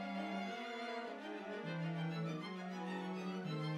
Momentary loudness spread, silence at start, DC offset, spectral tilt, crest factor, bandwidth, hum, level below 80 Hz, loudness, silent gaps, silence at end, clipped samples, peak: 4 LU; 0 s; under 0.1%; -6.5 dB/octave; 12 dB; 11 kHz; none; -88 dBFS; -44 LUFS; none; 0 s; under 0.1%; -32 dBFS